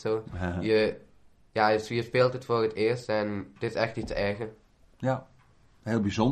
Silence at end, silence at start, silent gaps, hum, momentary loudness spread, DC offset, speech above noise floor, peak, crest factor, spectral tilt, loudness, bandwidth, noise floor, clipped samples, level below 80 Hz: 0 s; 0 s; none; none; 10 LU; under 0.1%; 32 dB; -10 dBFS; 20 dB; -6.5 dB/octave; -29 LUFS; 12.5 kHz; -60 dBFS; under 0.1%; -52 dBFS